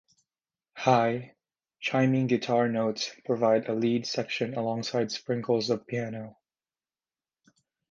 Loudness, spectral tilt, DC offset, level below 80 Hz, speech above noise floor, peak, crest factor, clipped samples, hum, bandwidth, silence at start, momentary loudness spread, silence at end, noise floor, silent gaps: -28 LUFS; -5.5 dB/octave; under 0.1%; -72 dBFS; over 63 dB; -6 dBFS; 22 dB; under 0.1%; none; 7.6 kHz; 0.75 s; 9 LU; 1.6 s; under -90 dBFS; none